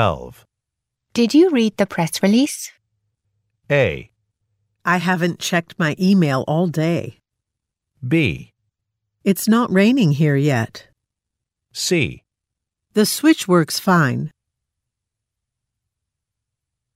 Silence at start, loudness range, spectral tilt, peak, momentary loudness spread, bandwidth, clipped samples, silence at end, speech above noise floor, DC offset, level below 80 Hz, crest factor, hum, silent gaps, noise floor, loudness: 0 s; 4 LU; -5.5 dB/octave; -2 dBFS; 12 LU; 16 kHz; under 0.1%; 2.7 s; 65 dB; under 0.1%; -52 dBFS; 18 dB; none; none; -83 dBFS; -18 LUFS